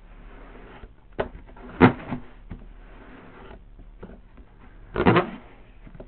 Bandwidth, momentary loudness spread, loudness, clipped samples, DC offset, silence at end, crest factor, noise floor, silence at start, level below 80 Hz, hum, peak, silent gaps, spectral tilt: 4.5 kHz; 27 LU; -23 LUFS; under 0.1%; under 0.1%; 0.05 s; 26 dB; -48 dBFS; 0.25 s; -44 dBFS; none; -2 dBFS; none; -11 dB/octave